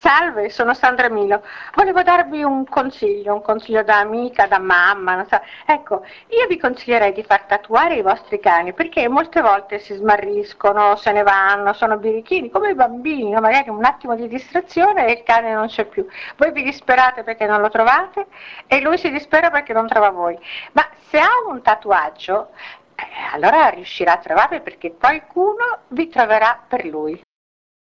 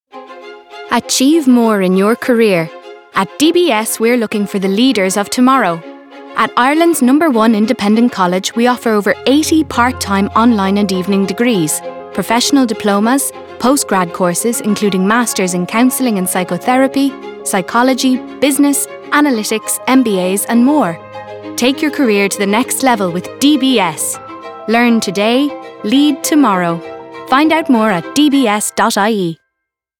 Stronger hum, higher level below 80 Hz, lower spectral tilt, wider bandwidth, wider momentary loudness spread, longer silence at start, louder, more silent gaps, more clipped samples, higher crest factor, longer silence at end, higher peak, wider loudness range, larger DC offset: neither; about the same, -54 dBFS vs -56 dBFS; about the same, -5 dB/octave vs -4 dB/octave; second, 7.4 kHz vs 19 kHz; about the same, 10 LU vs 8 LU; about the same, 0.05 s vs 0.15 s; second, -16 LUFS vs -13 LUFS; neither; neither; about the same, 16 dB vs 12 dB; about the same, 0.65 s vs 0.65 s; about the same, 0 dBFS vs 0 dBFS; about the same, 2 LU vs 2 LU; neither